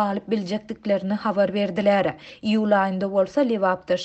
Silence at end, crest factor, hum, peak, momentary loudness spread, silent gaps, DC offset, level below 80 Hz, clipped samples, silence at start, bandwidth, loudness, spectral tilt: 0 s; 14 dB; none; -8 dBFS; 6 LU; none; under 0.1%; -62 dBFS; under 0.1%; 0 s; 8.2 kHz; -23 LUFS; -7 dB/octave